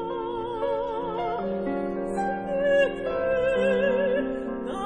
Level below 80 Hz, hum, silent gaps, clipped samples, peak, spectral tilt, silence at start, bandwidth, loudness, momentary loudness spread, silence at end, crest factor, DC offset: -48 dBFS; none; none; under 0.1%; -12 dBFS; -6.5 dB/octave; 0 s; 10 kHz; -26 LUFS; 8 LU; 0 s; 14 dB; under 0.1%